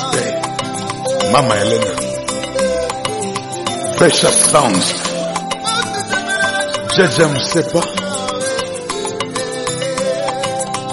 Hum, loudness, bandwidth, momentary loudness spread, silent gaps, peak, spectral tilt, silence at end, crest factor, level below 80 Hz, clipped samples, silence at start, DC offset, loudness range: none; -16 LUFS; 12 kHz; 10 LU; none; 0 dBFS; -3 dB/octave; 0 s; 16 dB; -46 dBFS; under 0.1%; 0 s; under 0.1%; 4 LU